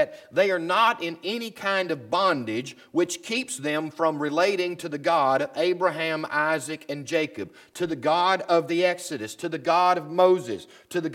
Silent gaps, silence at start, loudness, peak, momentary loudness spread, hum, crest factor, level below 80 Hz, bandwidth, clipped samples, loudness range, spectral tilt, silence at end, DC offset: none; 0 s; -25 LUFS; -6 dBFS; 11 LU; none; 18 dB; -74 dBFS; 16 kHz; under 0.1%; 2 LU; -4 dB/octave; 0 s; under 0.1%